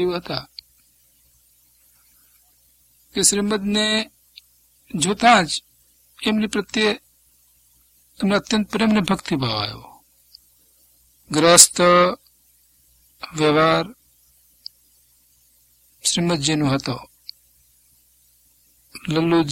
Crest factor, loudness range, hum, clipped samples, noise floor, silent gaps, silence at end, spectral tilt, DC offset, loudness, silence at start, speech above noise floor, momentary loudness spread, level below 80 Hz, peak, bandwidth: 22 dB; 8 LU; 60 Hz at -50 dBFS; under 0.1%; -58 dBFS; none; 0 s; -3 dB/octave; under 0.1%; -18 LUFS; 0 s; 40 dB; 21 LU; -54 dBFS; 0 dBFS; 16.5 kHz